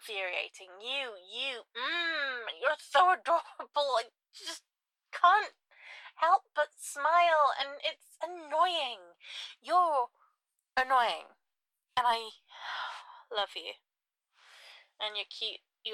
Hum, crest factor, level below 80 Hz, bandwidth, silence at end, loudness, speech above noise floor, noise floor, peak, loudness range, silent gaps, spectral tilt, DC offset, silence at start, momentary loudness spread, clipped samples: none; 20 dB; -78 dBFS; 14.5 kHz; 0 s; -31 LUFS; 57 dB; -88 dBFS; -12 dBFS; 8 LU; none; 0 dB/octave; under 0.1%; 0.05 s; 17 LU; under 0.1%